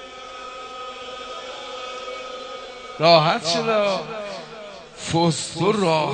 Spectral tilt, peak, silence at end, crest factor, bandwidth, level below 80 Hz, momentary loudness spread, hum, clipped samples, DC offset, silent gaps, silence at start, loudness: -4.5 dB/octave; 0 dBFS; 0 s; 24 dB; 9.4 kHz; -60 dBFS; 19 LU; none; under 0.1%; under 0.1%; none; 0 s; -21 LUFS